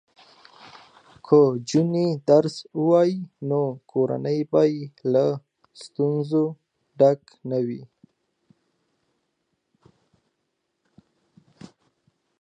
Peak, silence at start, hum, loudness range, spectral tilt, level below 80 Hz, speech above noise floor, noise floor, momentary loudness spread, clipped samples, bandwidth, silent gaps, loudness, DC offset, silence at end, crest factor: -4 dBFS; 1.25 s; none; 6 LU; -7.5 dB/octave; -72 dBFS; 55 dB; -77 dBFS; 11 LU; under 0.1%; 9.8 kHz; none; -22 LUFS; under 0.1%; 4.55 s; 20 dB